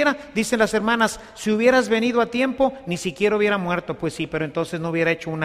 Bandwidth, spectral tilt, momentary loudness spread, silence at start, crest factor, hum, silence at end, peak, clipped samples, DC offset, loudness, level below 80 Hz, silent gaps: 15 kHz; -5 dB/octave; 8 LU; 0 s; 18 dB; none; 0 s; -4 dBFS; under 0.1%; under 0.1%; -21 LUFS; -52 dBFS; none